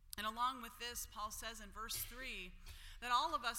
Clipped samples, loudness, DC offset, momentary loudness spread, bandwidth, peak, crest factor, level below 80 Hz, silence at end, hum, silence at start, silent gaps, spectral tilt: under 0.1%; -43 LUFS; under 0.1%; 13 LU; 16.5 kHz; -22 dBFS; 22 dB; -58 dBFS; 0 s; none; 0 s; none; -1 dB/octave